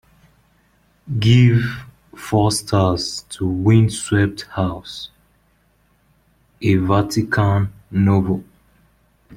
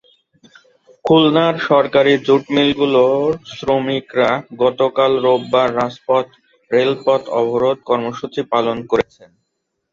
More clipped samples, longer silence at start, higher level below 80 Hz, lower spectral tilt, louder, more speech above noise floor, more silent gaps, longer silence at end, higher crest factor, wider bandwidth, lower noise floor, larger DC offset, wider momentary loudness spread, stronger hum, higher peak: neither; about the same, 1.05 s vs 1.05 s; first, -46 dBFS vs -54 dBFS; about the same, -6 dB/octave vs -6.5 dB/octave; about the same, -18 LUFS vs -16 LUFS; second, 43 dB vs 58 dB; neither; about the same, 0.95 s vs 0.9 s; about the same, 18 dB vs 16 dB; first, 14.5 kHz vs 7.6 kHz; second, -60 dBFS vs -73 dBFS; neither; first, 12 LU vs 7 LU; neither; about the same, -2 dBFS vs -2 dBFS